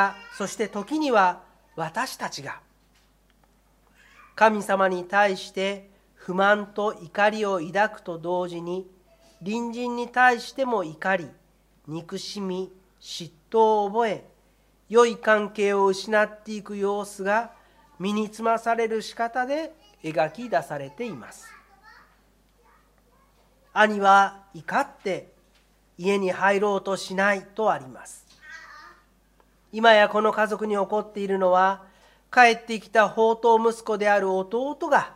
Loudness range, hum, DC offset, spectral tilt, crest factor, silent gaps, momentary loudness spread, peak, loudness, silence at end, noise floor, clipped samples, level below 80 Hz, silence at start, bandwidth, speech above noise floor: 7 LU; none; under 0.1%; -4.5 dB/octave; 24 dB; none; 17 LU; -2 dBFS; -24 LUFS; 0.05 s; -61 dBFS; under 0.1%; -64 dBFS; 0 s; 15.5 kHz; 38 dB